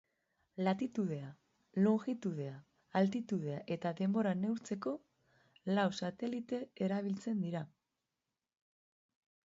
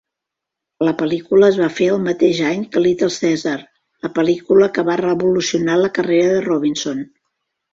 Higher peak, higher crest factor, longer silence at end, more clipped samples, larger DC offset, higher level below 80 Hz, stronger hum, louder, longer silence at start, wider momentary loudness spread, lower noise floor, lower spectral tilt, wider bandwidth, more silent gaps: second, -20 dBFS vs -2 dBFS; about the same, 18 dB vs 16 dB; first, 1.8 s vs 0.7 s; neither; neither; second, -80 dBFS vs -58 dBFS; neither; second, -37 LUFS vs -16 LUFS; second, 0.55 s vs 0.8 s; about the same, 11 LU vs 10 LU; first, under -90 dBFS vs -82 dBFS; first, -6.5 dB/octave vs -5 dB/octave; about the same, 7.6 kHz vs 7.8 kHz; neither